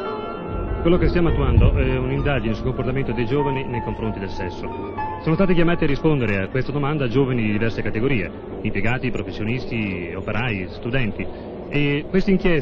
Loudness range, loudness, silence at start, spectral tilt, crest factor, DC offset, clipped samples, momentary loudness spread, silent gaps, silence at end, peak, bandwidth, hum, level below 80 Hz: 4 LU; -22 LUFS; 0 s; -8.5 dB/octave; 18 dB; under 0.1%; under 0.1%; 10 LU; none; 0 s; -4 dBFS; 6.8 kHz; none; -30 dBFS